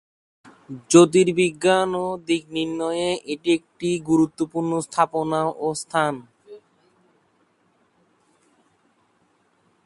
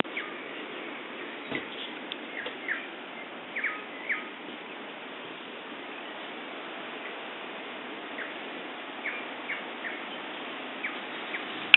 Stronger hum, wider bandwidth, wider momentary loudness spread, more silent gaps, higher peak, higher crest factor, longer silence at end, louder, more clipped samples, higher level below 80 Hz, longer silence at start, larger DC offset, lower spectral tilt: neither; first, 11.5 kHz vs 4.2 kHz; first, 10 LU vs 7 LU; neither; about the same, -2 dBFS vs 0 dBFS; second, 22 dB vs 34 dB; first, 3.3 s vs 0 s; first, -21 LUFS vs -36 LUFS; neither; first, -62 dBFS vs -82 dBFS; first, 0.7 s vs 0.05 s; neither; about the same, -5 dB/octave vs -5.5 dB/octave